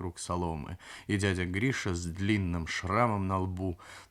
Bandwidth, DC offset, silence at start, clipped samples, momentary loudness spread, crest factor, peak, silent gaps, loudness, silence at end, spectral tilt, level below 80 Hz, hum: 13 kHz; under 0.1%; 0 s; under 0.1%; 10 LU; 20 dB; -12 dBFS; none; -32 LUFS; 0.05 s; -5.5 dB/octave; -56 dBFS; none